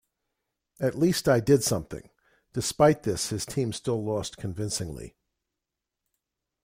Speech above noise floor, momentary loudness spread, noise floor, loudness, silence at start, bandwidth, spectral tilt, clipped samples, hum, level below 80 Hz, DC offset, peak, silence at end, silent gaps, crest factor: 60 dB; 15 LU; -86 dBFS; -26 LUFS; 0.8 s; 16.5 kHz; -5 dB/octave; under 0.1%; none; -54 dBFS; under 0.1%; -8 dBFS; 1.55 s; none; 20 dB